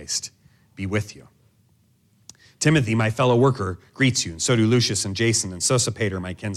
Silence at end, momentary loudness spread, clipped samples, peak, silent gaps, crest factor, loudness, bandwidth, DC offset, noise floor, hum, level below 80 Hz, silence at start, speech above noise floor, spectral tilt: 0 s; 10 LU; under 0.1%; -6 dBFS; none; 18 dB; -21 LUFS; 14 kHz; under 0.1%; -61 dBFS; none; -54 dBFS; 0 s; 40 dB; -4.5 dB/octave